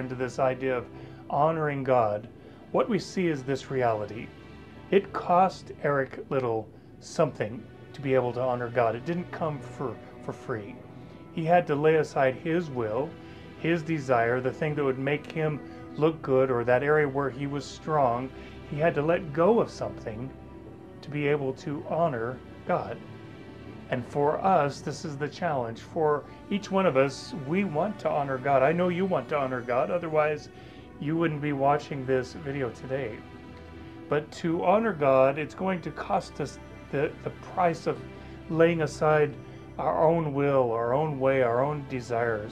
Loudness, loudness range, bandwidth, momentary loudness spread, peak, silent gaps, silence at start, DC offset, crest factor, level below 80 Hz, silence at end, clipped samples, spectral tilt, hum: -28 LUFS; 4 LU; 10.5 kHz; 19 LU; -8 dBFS; none; 0 s; under 0.1%; 20 dB; -56 dBFS; 0 s; under 0.1%; -7 dB/octave; none